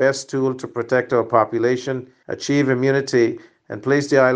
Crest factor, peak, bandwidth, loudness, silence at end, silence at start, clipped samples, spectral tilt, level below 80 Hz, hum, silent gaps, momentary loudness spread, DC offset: 18 dB; -2 dBFS; 9.8 kHz; -20 LUFS; 0 s; 0 s; under 0.1%; -5.5 dB/octave; -64 dBFS; none; none; 11 LU; under 0.1%